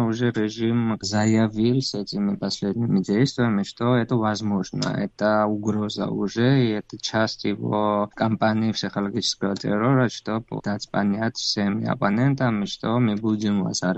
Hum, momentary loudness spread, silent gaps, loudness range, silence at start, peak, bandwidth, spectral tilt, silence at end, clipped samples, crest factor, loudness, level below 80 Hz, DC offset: none; 6 LU; none; 1 LU; 0 s; -8 dBFS; 8.2 kHz; -6 dB/octave; 0 s; under 0.1%; 16 dB; -23 LUFS; -58 dBFS; under 0.1%